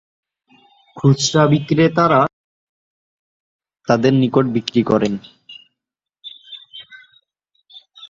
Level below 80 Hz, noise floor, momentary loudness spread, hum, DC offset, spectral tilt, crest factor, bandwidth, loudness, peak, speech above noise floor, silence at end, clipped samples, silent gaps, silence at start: -56 dBFS; -84 dBFS; 23 LU; none; under 0.1%; -6 dB/octave; 20 dB; 7.8 kHz; -16 LUFS; 0 dBFS; 70 dB; 0.05 s; under 0.1%; 2.33-3.59 s; 0.95 s